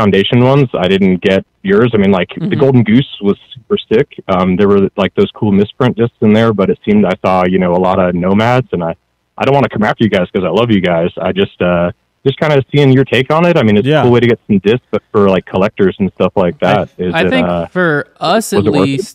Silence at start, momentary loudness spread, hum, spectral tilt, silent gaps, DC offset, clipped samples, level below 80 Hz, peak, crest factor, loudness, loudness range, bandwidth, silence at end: 0 s; 6 LU; none; -7 dB/octave; none; under 0.1%; 0.7%; -44 dBFS; 0 dBFS; 12 dB; -12 LUFS; 2 LU; 14 kHz; 0.05 s